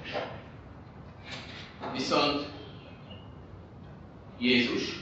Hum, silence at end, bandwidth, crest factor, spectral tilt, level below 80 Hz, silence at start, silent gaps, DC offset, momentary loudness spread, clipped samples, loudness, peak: none; 0 s; 8 kHz; 22 dB; -2.5 dB/octave; -56 dBFS; 0 s; none; under 0.1%; 23 LU; under 0.1%; -30 LUFS; -12 dBFS